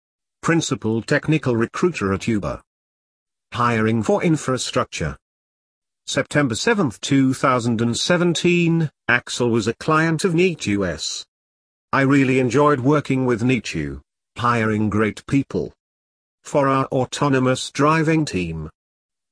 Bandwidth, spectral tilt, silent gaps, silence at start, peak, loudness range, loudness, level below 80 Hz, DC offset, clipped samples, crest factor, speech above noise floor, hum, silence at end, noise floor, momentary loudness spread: 11 kHz; -5.5 dB/octave; 2.67-3.26 s, 5.22-5.82 s, 11.28-11.88 s, 15.80-16.38 s; 0.45 s; -2 dBFS; 4 LU; -20 LUFS; -48 dBFS; under 0.1%; under 0.1%; 18 dB; over 71 dB; none; 0.6 s; under -90 dBFS; 10 LU